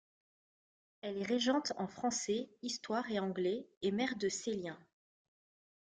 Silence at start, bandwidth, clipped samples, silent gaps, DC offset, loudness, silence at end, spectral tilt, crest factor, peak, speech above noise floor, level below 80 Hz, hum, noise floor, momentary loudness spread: 1.05 s; 9.6 kHz; under 0.1%; 3.77-3.81 s; under 0.1%; -37 LUFS; 1.15 s; -3.5 dB/octave; 18 dB; -20 dBFS; over 53 dB; -78 dBFS; none; under -90 dBFS; 8 LU